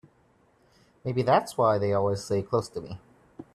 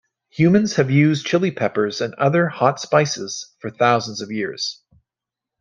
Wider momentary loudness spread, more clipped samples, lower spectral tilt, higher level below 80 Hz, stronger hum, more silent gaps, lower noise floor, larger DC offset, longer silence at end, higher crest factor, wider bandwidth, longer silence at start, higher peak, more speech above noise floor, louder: first, 15 LU vs 11 LU; neither; about the same, -6.5 dB/octave vs -5.5 dB/octave; about the same, -62 dBFS vs -62 dBFS; neither; neither; second, -64 dBFS vs -87 dBFS; neither; second, 0.15 s vs 0.85 s; about the same, 20 dB vs 18 dB; first, 13.5 kHz vs 9 kHz; first, 1.05 s vs 0.35 s; second, -8 dBFS vs -2 dBFS; second, 38 dB vs 68 dB; second, -26 LUFS vs -19 LUFS